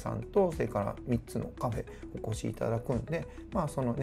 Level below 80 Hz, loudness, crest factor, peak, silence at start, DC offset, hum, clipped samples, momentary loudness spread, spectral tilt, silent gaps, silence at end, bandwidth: -48 dBFS; -34 LUFS; 16 dB; -16 dBFS; 0 s; under 0.1%; none; under 0.1%; 9 LU; -7.5 dB/octave; none; 0 s; 15 kHz